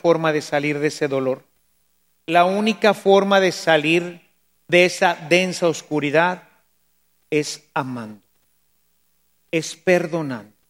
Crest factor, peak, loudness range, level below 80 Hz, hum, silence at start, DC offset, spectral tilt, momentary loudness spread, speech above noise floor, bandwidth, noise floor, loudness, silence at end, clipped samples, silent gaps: 20 dB; 0 dBFS; 9 LU; -72 dBFS; none; 0.05 s; under 0.1%; -4.5 dB/octave; 12 LU; 48 dB; 16.5 kHz; -67 dBFS; -19 LUFS; 0.25 s; under 0.1%; none